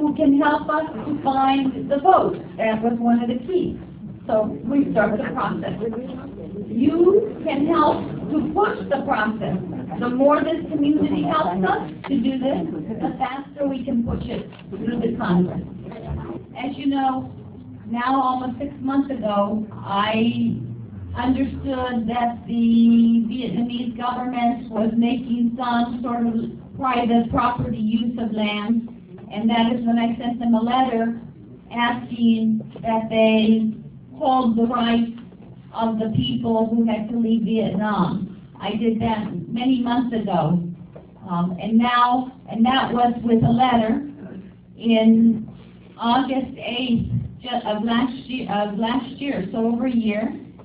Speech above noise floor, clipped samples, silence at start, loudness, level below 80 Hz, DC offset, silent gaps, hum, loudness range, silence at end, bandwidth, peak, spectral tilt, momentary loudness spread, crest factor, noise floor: 22 dB; under 0.1%; 0 s; -21 LUFS; -46 dBFS; under 0.1%; none; none; 4 LU; 0 s; 4 kHz; -2 dBFS; -10.5 dB/octave; 13 LU; 20 dB; -42 dBFS